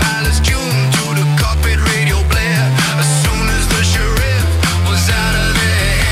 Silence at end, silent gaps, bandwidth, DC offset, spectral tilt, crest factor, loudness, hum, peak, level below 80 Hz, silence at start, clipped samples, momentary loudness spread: 0 s; none; 16 kHz; under 0.1%; -4 dB/octave; 10 dB; -13 LUFS; none; -4 dBFS; -18 dBFS; 0 s; under 0.1%; 1 LU